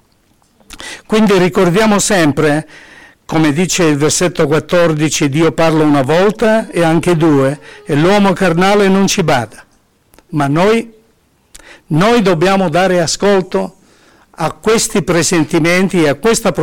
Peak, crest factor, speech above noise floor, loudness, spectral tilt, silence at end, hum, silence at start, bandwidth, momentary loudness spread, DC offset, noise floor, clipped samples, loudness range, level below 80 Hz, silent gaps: -4 dBFS; 8 dB; 43 dB; -12 LUFS; -5 dB/octave; 0 s; none; 0 s; 18 kHz; 8 LU; 2%; -54 dBFS; under 0.1%; 3 LU; -40 dBFS; none